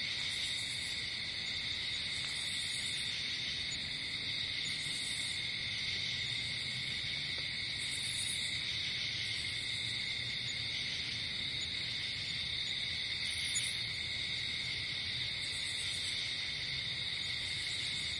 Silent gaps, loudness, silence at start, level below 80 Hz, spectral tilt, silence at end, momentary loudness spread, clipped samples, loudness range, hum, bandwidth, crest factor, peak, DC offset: none; -35 LUFS; 0 s; -62 dBFS; -1 dB/octave; 0 s; 1 LU; under 0.1%; 1 LU; none; 11.5 kHz; 16 dB; -22 dBFS; under 0.1%